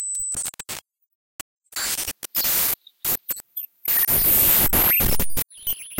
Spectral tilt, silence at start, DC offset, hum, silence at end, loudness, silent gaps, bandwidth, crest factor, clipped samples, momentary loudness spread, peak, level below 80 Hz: -1.5 dB/octave; 0 s; under 0.1%; none; 0 s; -19 LUFS; 1.15-1.57 s; 17.5 kHz; 18 dB; under 0.1%; 19 LU; -4 dBFS; -38 dBFS